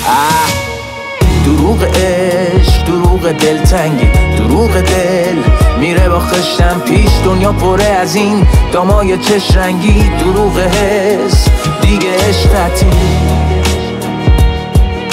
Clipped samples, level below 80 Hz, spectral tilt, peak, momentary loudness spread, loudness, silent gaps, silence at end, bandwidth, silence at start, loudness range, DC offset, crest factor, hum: under 0.1%; -14 dBFS; -5.5 dB/octave; 0 dBFS; 2 LU; -10 LUFS; none; 0 s; 16 kHz; 0 s; 1 LU; under 0.1%; 10 dB; none